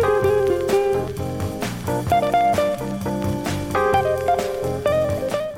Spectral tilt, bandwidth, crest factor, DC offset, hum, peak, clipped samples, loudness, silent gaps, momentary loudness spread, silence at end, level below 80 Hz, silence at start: -6 dB/octave; 17 kHz; 16 dB; under 0.1%; none; -4 dBFS; under 0.1%; -21 LUFS; none; 8 LU; 0 s; -42 dBFS; 0 s